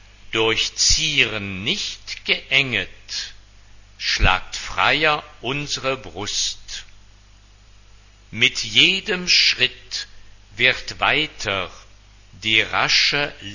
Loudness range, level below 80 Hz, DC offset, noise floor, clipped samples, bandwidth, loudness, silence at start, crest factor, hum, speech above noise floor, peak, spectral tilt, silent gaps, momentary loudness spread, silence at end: 5 LU; -38 dBFS; under 0.1%; -49 dBFS; under 0.1%; 7.4 kHz; -19 LUFS; 0.25 s; 22 dB; 50 Hz at -50 dBFS; 28 dB; 0 dBFS; -1.5 dB/octave; none; 14 LU; 0 s